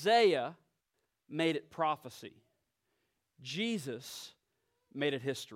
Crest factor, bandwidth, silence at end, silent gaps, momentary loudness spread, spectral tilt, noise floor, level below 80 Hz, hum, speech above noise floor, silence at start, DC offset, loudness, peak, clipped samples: 18 dB; 16.5 kHz; 0 s; none; 21 LU; -4.5 dB/octave; -84 dBFS; -86 dBFS; none; 50 dB; 0 s; under 0.1%; -34 LUFS; -18 dBFS; under 0.1%